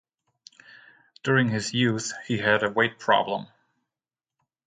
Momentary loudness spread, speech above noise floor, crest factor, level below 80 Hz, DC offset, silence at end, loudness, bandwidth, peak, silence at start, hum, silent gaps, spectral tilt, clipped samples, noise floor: 9 LU; over 66 dB; 22 dB; -66 dBFS; under 0.1%; 1.2 s; -24 LUFS; 9.4 kHz; -6 dBFS; 1.25 s; none; none; -4.5 dB/octave; under 0.1%; under -90 dBFS